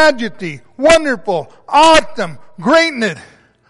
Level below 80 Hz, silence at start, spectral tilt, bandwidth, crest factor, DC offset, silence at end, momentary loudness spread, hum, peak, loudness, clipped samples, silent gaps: -40 dBFS; 0 s; -3.5 dB/octave; 11.5 kHz; 12 dB; under 0.1%; 0 s; 16 LU; none; 0 dBFS; -13 LUFS; under 0.1%; none